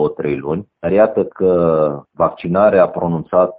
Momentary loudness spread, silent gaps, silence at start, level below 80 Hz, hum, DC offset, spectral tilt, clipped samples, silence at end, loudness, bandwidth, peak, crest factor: 9 LU; none; 0 s; -48 dBFS; none; under 0.1%; -7.5 dB/octave; under 0.1%; 0.05 s; -16 LUFS; 4.7 kHz; -2 dBFS; 14 dB